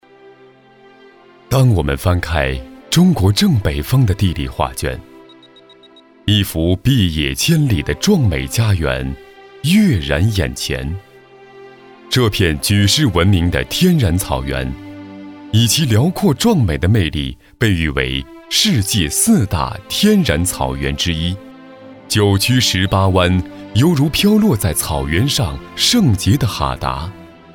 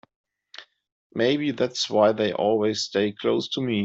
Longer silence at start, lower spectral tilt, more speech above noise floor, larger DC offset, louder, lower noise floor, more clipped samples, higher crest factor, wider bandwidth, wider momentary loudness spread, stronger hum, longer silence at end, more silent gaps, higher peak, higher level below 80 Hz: first, 1.5 s vs 0.6 s; about the same, -5 dB/octave vs -4.5 dB/octave; first, 31 dB vs 25 dB; neither; first, -15 LUFS vs -23 LUFS; about the same, -45 dBFS vs -48 dBFS; neither; about the same, 14 dB vs 18 dB; first, 19.5 kHz vs 8 kHz; second, 10 LU vs 16 LU; neither; first, 0.25 s vs 0 s; second, none vs 0.92-1.10 s; first, -2 dBFS vs -6 dBFS; first, -30 dBFS vs -66 dBFS